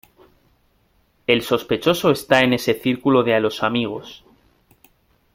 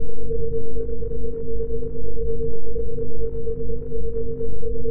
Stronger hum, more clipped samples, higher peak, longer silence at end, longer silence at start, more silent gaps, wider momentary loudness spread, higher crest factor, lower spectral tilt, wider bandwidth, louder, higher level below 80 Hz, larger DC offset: neither; neither; first, -2 dBFS vs -8 dBFS; first, 1.2 s vs 0 s; first, 1.3 s vs 0 s; neither; first, 11 LU vs 2 LU; first, 20 dB vs 6 dB; second, -5 dB/octave vs -14.5 dB/octave; first, 16.5 kHz vs 1.6 kHz; first, -19 LUFS vs -29 LUFS; second, -56 dBFS vs -32 dBFS; neither